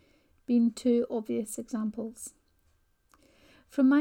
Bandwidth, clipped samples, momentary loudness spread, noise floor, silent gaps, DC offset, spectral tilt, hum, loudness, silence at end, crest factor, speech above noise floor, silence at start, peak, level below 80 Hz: 16.5 kHz; under 0.1%; 17 LU; -69 dBFS; none; under 0.1%; -5.5 dB/octave; none; -30 LUFS; 0 s; 16 dB; 42 dB; 0.5 s; -14 dBFS; -68 dBFS